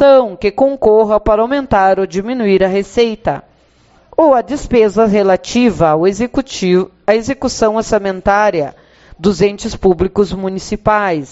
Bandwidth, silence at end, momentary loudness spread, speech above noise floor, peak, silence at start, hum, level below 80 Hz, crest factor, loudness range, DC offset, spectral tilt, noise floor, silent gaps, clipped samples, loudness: 8 kHz; 0.05 s; 7 LU; 37 dB; 0 dBFS; 0 s; none; -36 dBFS; 12 dB; 2 LU; under 0.1%; -5 dB/octave; -49 dBFS; none; under 0.1%; -13 LUFS